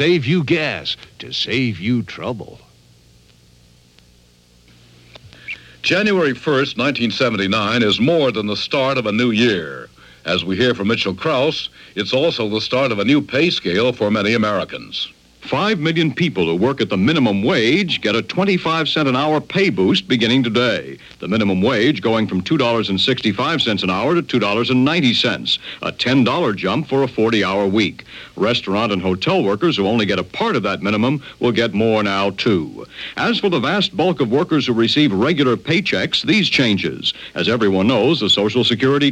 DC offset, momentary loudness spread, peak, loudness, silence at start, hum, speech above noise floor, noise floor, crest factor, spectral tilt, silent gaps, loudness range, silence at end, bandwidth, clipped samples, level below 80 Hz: under 0.1%; 7 LU; -2 dBFS; -17 LUFS; 0 s; none; 34 dB; -51 dBFS; 16 dB; -5.5 dB/octave; none; 4 LU; 0 s; 11 kHz; under 0.1%; -54 dBFS